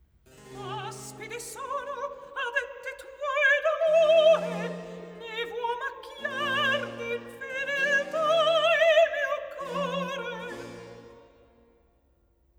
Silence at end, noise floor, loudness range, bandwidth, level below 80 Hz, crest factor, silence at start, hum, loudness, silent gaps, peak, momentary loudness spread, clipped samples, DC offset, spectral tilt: 1.4 s; -66 dBFS; 8 LU; 15.5 kHz; -66 dBFS; 18 dB; 0.4 s; none; -26 LUFS; none; -10 dBFS; 19 LU; under 0.1%; under 0.1%; -3 dB/octave